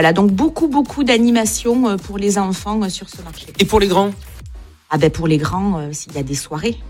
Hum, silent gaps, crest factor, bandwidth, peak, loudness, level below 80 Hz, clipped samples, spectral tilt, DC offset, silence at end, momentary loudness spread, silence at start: none; none; 16 dB; 16.5 kHz; 0 dBFS; -17 LUFS; -36 dBFS; under 0.1%; -5 dB/octave; under 0.1%; 0 s; 14 LU; 0 s